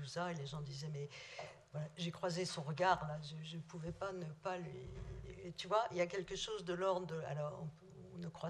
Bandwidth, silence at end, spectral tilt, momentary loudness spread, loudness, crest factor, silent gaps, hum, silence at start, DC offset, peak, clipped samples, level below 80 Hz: 12 kHz; 0 s; -5 dB/octave; 13 LU; -43 LUFS; 22 dB; none; none; 0 s; under 0.1%; -20 dBFS; under 0.1%; -64 dBFS